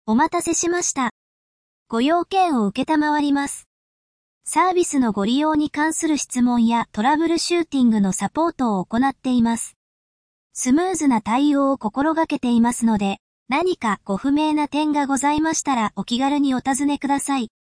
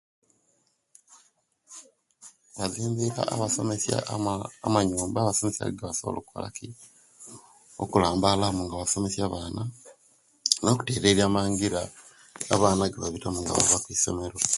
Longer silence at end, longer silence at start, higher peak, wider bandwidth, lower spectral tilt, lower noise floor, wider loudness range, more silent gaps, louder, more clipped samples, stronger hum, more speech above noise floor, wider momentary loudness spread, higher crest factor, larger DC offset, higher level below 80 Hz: first, 0.2 s vs 0 s; second, 0.05 s vs 1.1 s; second, -6 dBFS vs 0 dBFS; second, 10.5 kHz vs 12 kHz; about the same, -4 dB/octave vs -4 dB/octave; first, under -90 dBFS vs -70 dBFS; second, 2 LU vs 6 LU; first, 1.11-1.86 s, 3.66-4.41 s, 9.76-10.50 s, 13.20-13.46 s vs none; first, -20 LUFS vs -26 LUFS; neither; neither; first, over 71 dB vs 44 dB; second, 5 LU vs 18 LU; second, 14 dB vs 28 dB; neither; about the same, -54 dBFS vs -50 dBFS